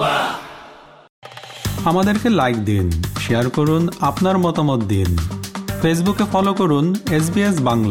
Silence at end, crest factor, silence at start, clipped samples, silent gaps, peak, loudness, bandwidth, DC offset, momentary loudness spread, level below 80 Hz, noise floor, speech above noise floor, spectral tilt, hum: 0 s; 14 dB; 0 s; under 0.1%; 1.09-1.22 s; -4 dBFS; -18 LUFS; 17 kHz; under 0.1%; 11 LU; -40 dBFS; -41 dBFS; 25 dB; -6 dB/octave; none